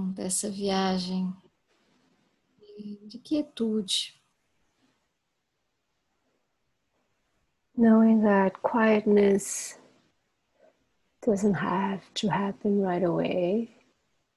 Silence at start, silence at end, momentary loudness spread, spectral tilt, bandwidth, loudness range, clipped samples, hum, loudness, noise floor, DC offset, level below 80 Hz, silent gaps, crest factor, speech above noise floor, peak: 0 s; 0.7 s; 17 LU; -5 dB/octave; 12.5 kHz; 10 LU; under 0.1%; none; -26 LUFS; -79 dBFS; under 0.1%; -66 dBFS; none; 18 dB; 54 dB; -10 dBFS